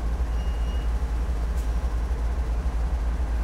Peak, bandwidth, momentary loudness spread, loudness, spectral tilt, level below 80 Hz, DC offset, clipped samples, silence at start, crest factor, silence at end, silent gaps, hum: -16 dBFS; 9.8 kHz; 0 LU; -29 LUFS; -7 dB/octave; -26 dBFS; under 0.1%; under 0.1%; 0 s; 8 dB; 0 s; none; none